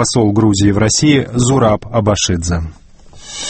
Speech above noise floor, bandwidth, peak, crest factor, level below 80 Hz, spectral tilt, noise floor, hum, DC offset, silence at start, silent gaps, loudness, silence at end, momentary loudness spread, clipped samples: 23 dB; 8.8 kHz; 0 dBFS; 14 dB; -32 dBFS; -5 dB/octave; -36 dBFS; none; under 0.1%; 0 s; none; -13 LUFS; 0 s; 9 LU; under 0.1%